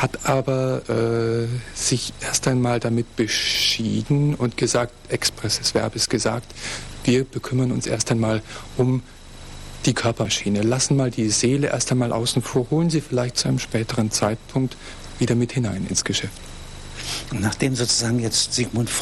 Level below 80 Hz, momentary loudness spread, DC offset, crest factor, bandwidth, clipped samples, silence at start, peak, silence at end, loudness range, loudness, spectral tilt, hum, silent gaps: -42 dBFS; 9 LU; under 0.1%; 14 dB; 14.5 kHz; under 0.1%; 0 s; -8 dBFS; 0 s; 3 LU; -22 LUFS; -4 dB/octave; none; none